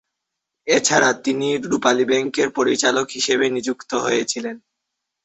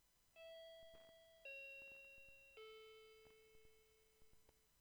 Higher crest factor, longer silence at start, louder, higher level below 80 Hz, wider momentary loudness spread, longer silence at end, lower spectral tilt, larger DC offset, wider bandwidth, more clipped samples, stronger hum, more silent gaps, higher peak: about the same, 20 dB vs 16 dB; first, 0.65 s vs 0 s; first, -19 LUFS vs -60 LUFS; first, -62 dBFS vs -82 dBFS; second, 9 LU vs 12 LU; first, 0.65 s vs 0 s; about the same, -2.5 dB/octave vs -1.5 dB/octave; neither; second, 8.4 kHz vs over 20 kHz; neither; neither; neither; first, 0 dBFS vs -48 dBFS